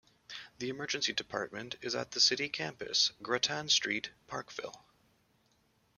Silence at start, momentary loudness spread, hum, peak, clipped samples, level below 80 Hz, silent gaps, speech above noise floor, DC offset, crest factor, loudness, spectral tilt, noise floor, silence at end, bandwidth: 0.3 s; 16 LU; none; -14 dBFS; under 0.1%; -74 dBFS; none; 37 dB; under 0.1%; 22 dB; -32 LUFS; -1 dB/octave; -72 dBFS; 1.2 s; 14 kHz